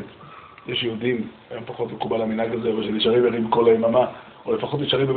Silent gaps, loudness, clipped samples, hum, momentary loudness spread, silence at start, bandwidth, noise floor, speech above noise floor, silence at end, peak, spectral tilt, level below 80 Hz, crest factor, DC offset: none; -22 LUFS; under 0.1%; none; 18 LU; 0 s; 4.6 kHz; -44 dBFS; 22 dB; 0 s; -6 dBFS; -4 dB/octave; -58 dBFS; 18 dB; under 0.1%